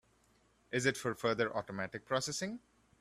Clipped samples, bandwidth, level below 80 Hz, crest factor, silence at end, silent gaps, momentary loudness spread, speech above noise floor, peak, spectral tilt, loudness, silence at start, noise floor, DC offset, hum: under 0.1%; 15.5 kHz; -70 dBFS; 24 dB; 0.45 s; none; 8 LU; 34 dB; -14 dBFS; -4 dB/octave; -36 LUFS; 0.7 s; -71 dBFS; under 0.1%; none